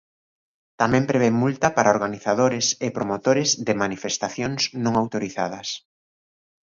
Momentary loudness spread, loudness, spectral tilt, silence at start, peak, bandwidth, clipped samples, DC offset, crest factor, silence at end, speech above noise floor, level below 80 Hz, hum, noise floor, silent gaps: 8 LU; -22 LUFS; -4 dB/octave; 0.8 s; -2 dBFS; 7.6 kHz; under 0.1%; under 0.1%; 22 dB; 0.95 s; over 68 dB; -58 dBFS; none; under -90 dBFS; none